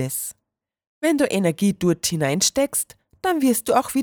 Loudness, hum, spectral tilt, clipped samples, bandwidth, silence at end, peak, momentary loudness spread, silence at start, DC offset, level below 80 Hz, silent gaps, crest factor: -21 LUFS; none; -4 dB/octave; under 0.1%; over 20 kHz; 0 s; -6 dBFS; 8 LU; 0 s; under 0.1%; -56 dBFS; 0.87-1.01 s; 16 dB